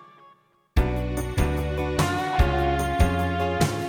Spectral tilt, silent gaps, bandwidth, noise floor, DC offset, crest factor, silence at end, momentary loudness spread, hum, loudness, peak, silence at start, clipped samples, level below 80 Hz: -6 dB/octave; none; 18.5 kHz; -58 dBFS; under 0.1%; 18 dB; 0 s; 4 LU; none; -25 LUFS; -6 dBFS; 0.75 s; under 0.1%; -28 dBFS